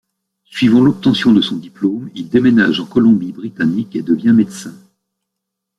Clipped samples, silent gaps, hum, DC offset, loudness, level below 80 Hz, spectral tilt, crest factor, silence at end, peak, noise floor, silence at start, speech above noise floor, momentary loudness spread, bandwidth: under 0.1%; none; none; under 0.1%; -14 LUFS; -52 dBFS; -6.5 dB/octave; 14 dB; 1.1 s; -2 dBFS; -78 dBFS; 0.55 s; 64 dB; 12 LU; 11 kHz